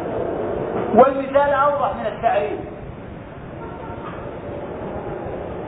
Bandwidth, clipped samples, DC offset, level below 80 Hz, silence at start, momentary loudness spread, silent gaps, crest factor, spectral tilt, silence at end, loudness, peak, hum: 4 kHz; under 0.1%; under 0.1%; -44 dBFS; 0 s; 19 LU; none; 20 dB; -11 dB/octave; 0 s; -21 LUFS; 0 dBFS; none